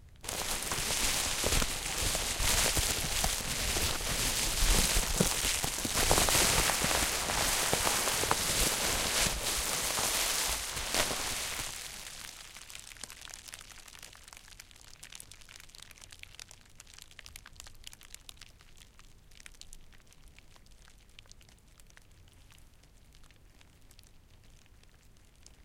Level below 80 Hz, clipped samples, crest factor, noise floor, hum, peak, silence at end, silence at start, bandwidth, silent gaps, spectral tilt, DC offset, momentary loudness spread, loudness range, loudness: -42 dBFS; under 0.1%; 24 dB; -59 dBFS; none; -10 dBFS; 0.15 s; 0 s; 17 kHz; none; -1.5 dB/octave; under 0.1%; 23 LU; 23 LU; -29 LUFS